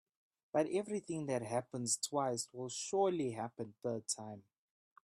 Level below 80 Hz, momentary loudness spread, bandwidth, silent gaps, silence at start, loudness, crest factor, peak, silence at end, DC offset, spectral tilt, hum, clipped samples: -80 dBFS; 9 LU; 14.5 kHz; none; 0.55 s; -38 LUFS; 18 dB; -22 dBFS; 0.65 s; under 0.1%; -4 dB/octave; none; under 0.1%